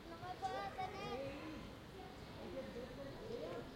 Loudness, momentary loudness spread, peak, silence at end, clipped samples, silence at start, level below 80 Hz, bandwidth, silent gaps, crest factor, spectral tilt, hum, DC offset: -48 LUFS; 9 LU; -32 dBFS; 0 s; under 0.1%; 0 s; -64 dBFS; 16 kHz; none; 16 dB; -5.5 dB/octave; none; under 0.1%